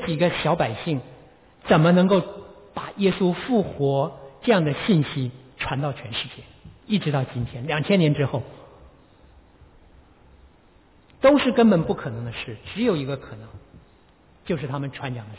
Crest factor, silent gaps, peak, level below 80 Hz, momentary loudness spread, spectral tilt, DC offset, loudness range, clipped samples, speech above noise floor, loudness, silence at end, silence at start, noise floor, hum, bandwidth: 18 dB; none; -6 dBFS; -52 dBFS; 17 LU; -11 dB/octave; under 0.1%; 5 LU; under 0.1%; 33 dB; -23 LUFS; 0 s; 0 s; -55 dBFS; none; 4 kHz